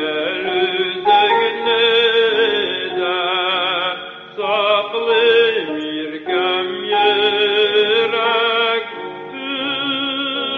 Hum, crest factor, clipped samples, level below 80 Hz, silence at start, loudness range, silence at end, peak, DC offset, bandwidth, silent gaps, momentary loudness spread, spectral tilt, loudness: none; 14 dB; under 0.1%; -62 dBFS; 0 s; 2 LU; 0 s; -2 dBFS; under 0.1%; 6 kHz; none; 10 LU; -5 dB/octave; -16 LUFS